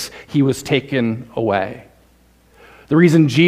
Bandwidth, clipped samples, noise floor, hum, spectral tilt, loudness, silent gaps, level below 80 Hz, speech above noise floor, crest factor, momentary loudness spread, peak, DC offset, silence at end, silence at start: 15.5 kHz; under 0.1%; -53 dBFS; none; -6.5 dB/octave; -17 LUFS; none; -52 dBFS; 38 dB; 16 dB; 10 LU; 0 dBFS; under 0.1%; 0 s; 0 s